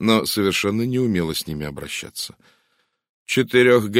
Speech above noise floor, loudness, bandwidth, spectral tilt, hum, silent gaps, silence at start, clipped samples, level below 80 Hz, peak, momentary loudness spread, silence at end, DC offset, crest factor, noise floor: 48 dB; -21 LUFS; 16 kHz; -4.5 dB/octave; none; 3.09-3.26 s; 0 s; under 0.1%; -50 dBFS; -2 dBFS; 14 LU; 0 s; under 0.1%; 18 dB; -68 dBFS